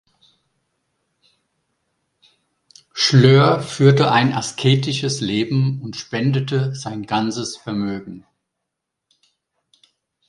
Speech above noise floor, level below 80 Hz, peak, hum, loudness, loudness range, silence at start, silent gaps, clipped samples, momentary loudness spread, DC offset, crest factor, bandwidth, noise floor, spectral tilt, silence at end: 63 dB; -58 dBFS; 0 dBFS; none; -18 LUFS; 11 LU; 2.95 s; none; under 0.1%; 14 LU; under 0.1%; 20 dB; 11 kHz; -80 dBFS; -5.5 dB/octave; 2.1 s